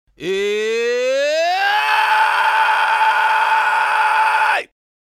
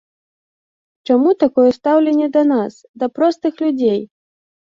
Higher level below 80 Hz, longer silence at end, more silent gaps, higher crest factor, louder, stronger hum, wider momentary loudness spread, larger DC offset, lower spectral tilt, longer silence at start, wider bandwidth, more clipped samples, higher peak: about the same, -66 dBFS vs -64 dBFS; second, 0.35 s vs 0.7 s; second, none vs 2.89-2.94 s; about the same, 14 dB vs 14 dB; about the same, -15 LUFS vs -16 LUFS; neither; second, 5 LU vs 10 LU; neither; second, -1.5 dB/octave vs -7 dB/octave; second, 0.2 s vs 1.1 s; first, 15 kHz vs 7.4 kHz; neither; about the same, -2 dBFS vs -2 dBFS